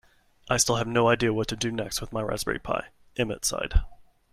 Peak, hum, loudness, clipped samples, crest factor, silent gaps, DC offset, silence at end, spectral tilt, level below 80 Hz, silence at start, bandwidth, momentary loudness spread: -6 dBFS; none; -27 LUFS; under 0.1%; 20 dB; none; under 0.1%; 0.3 s; -3.5 dB/octave; -36 dBFS; 0.45 s; 16 kHz; 8 LU